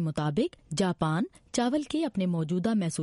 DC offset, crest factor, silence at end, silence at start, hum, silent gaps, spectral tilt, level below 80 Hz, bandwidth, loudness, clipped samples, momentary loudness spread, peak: under 0.1%; 14 dB; 0 s; 0 s; none; none; -6 dB/octave; -58 dBFS; 11.5 kHz; -29 LUFS; under 0.1%; 4 LU; -14 dBFS